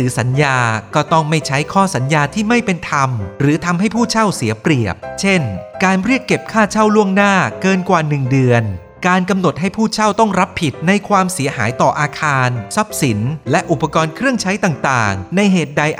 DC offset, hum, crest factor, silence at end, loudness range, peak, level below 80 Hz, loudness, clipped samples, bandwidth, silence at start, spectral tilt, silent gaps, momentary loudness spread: under 0.1%; none; 14 dB; 0 s; 2 LU; 0 dBFS; -46 dBFS; -15 LUFS; under 0.1%; 14.5 kHz; 0 s; -5.5 dB/octave; none; 4 LU